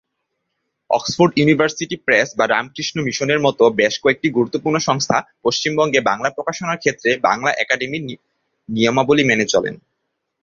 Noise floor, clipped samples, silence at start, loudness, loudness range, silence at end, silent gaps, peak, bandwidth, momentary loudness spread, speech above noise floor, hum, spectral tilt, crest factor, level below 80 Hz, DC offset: -75 dBFS; under 0.1%; 0.9 s; -17 LUFS; 2 LU; 0.65 s; none; 0 dBFS; 7.4 kHz; 8 LU; 57 dB; none; -4 dB/octave; 18 dB; -58 dBFS; under 0.1%